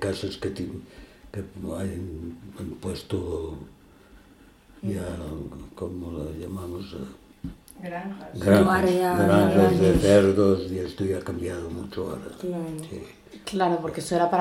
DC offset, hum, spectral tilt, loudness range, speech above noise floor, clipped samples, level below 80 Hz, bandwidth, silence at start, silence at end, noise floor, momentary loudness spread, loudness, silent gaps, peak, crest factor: under 0.1%; none; -6.5 dB/octave; 15 LU; 28 dB; under 0.1%; -46 dBFS; 16.5 kHz; 0 s; 0 s; -53 dBFS; 21 LU; -25 LUFS; none; -6 dBFS; 20 dB